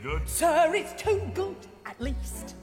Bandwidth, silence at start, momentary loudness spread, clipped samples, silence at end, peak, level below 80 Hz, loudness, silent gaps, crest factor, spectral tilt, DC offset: 16.5 kHz; 0 s; 15 LU; under 0.1%; 0 s; -12 dBFS; -38 dBFS; -28 LUFS; none; 16 dB; -4 dB/octave; under 0.1%